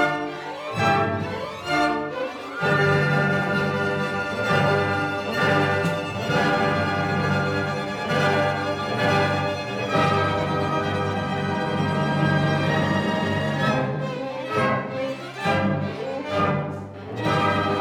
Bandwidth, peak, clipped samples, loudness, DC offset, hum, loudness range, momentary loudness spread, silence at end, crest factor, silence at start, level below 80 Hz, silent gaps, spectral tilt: 15 kHz; -6 dBFS; under 0.1%; -23 LUFS; under 0.1%; none; 3 LU; 8 LU; 0 s; 16 dB; 0 s; -54 dBFS; none; -6 dB/octave